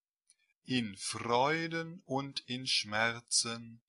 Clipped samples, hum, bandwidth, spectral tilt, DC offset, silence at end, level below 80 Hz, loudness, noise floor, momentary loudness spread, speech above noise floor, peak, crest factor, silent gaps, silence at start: under 0.1%; none; 11.5 kHz; -2.5 dB/octave; under 0.1%; 0.1 s; -74 dBFS; -33 LUFS; -73 dBFS; 9 LU; 38 dB; -14 dBFS; 20 dB; none; 0.65 s